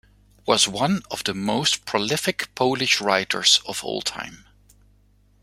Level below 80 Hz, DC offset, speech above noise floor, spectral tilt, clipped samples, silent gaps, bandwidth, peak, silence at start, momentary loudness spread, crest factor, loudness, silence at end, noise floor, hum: -58 dBFS; under 0.1%; 35 dB; -2.5 dB/octave; under 0.1%; none; 16.5 kHz; -2 dBFS; 0.45 s; 11 LU; 22 dB; -21 LUFS; 1.05 s; -58 dBFS; 50 Hz at -50 dBFS